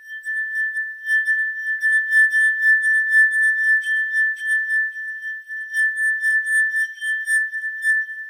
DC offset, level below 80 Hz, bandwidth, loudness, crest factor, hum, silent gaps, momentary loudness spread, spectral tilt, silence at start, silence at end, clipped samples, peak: under 0.1%; under -90 dBFS; 16 kHz; -18 LUFS; 12 dB; none; none; 10 LU; 12.5 dB/octave; 0 s; 0 s; under 0.1%; -8 dBFS